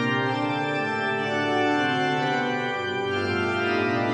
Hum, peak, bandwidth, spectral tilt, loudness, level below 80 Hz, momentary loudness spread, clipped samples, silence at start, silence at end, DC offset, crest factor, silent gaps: none; -12 dBFS; 10 kHz; -5.5 dB/octave; -24 LUFS; -70 dBFS; 3 LU; under 0.1%; 0 s; 0 s; under 0.1%; 14 dB; none